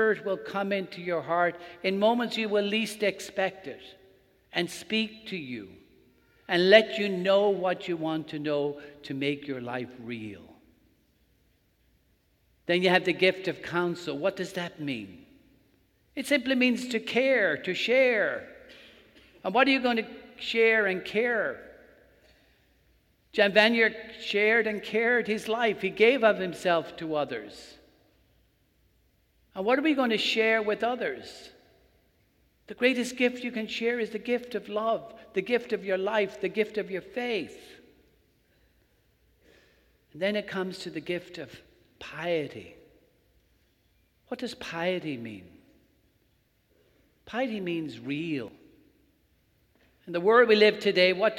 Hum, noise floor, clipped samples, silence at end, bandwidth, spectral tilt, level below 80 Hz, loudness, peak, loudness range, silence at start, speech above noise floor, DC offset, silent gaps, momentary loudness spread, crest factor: none; -69 dBFS; under 0.1%; 0 s; 16 kHz; -4.5 dB/octave; -68 dBFS; -27 LUFS; -4 dBFS; 12 LU; 0 s; 42 dB; under 0.1%; none; 16 LU; 24 dB